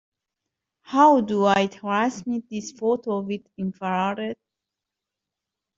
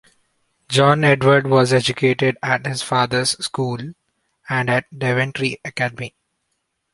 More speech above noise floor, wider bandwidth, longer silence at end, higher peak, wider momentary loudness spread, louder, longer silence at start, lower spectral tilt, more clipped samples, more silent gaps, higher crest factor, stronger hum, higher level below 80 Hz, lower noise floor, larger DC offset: first, 63 dB vs 55 dB; second, 7.8 kHz vs 11.5 kHz; first, 1.45 s vs 0.85 s; second, -6 dBFS vs -2 dBFS; first, 15 LU vs 10 LU; second, -23 LUFS vs -18 LUFS; first, 0.9 s vs 0.7 s; about the same, -5.5 dB/octave vs -5 dB/octave; neither; neither; about the same, 20 dB vs 18 dB; neither; second, -66 dBFS vs -56 dBFS; first, -86 dBFS vs -73 dBFS; neither